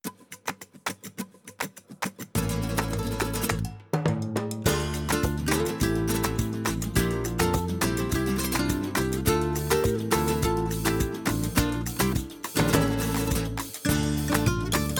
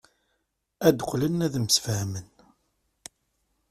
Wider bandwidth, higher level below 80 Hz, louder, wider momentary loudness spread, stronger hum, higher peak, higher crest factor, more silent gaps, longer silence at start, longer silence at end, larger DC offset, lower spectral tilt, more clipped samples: first, 19 kHz vs 15.5 kHz; first, -38 dBFS vs -58 dBFS; about the same, -27 LUFS vs -25 LUFS; second, 10 LU vs 24 LU; neither; about the same, -6 dBFS vs -4 dBFS; about the same, 20 dB vs 24 dB; neither; second, 0.05 s vs 0.8 s; second, 0 s vs 1.45 s; neither; about the same, -5 dB/octave vs -4.5 dB/octave; neither